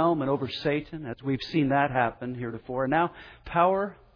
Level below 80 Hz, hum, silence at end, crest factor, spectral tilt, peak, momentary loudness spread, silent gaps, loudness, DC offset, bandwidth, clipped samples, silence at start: -54 dBFS; none; 0.2 s; 18 dB; -8 dB/octave; -10 dBFS; 11 LU; none; -27 LUFS; under 0.1%; 5.4 kHz; under 0.1%; 0 s